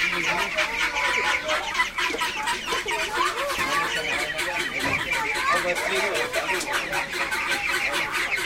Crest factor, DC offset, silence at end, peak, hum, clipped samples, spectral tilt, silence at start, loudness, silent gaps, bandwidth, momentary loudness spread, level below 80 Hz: 16 dB; under 0.1%; 0 s; -10 dBFS; none; under 0.1%; -1.5 dB/octave; 0 s; -24 LUFS; none; 16.5 kHz; 3 LU; -50 dBFS